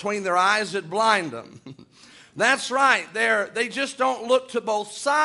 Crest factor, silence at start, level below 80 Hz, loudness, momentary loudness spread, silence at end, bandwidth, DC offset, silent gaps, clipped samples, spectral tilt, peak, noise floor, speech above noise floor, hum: 20 dB; 0 s; -72 dBFS; -22 LUFS; 7 LU; 0 s; 11.5 kHz; under 0.1%; none; under 0.1%; -2.5 dB/octave; -4 dBFS; -51 dBFS; 28 dB; none